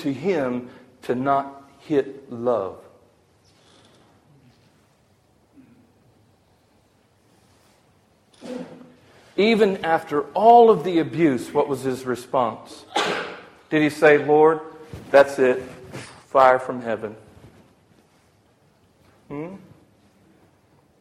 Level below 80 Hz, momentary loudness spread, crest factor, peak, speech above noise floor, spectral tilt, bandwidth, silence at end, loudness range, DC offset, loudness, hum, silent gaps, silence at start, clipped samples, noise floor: -62 dBFS; 22 LU; 22 dB; -2 dBFS; 40 dB; -6 dB/octave; 13.5 kHz; 1.45 s; 18 LU; under 0.1%; -20 LUFS; none; none; 0 s; under 0.1%; -60 dBFS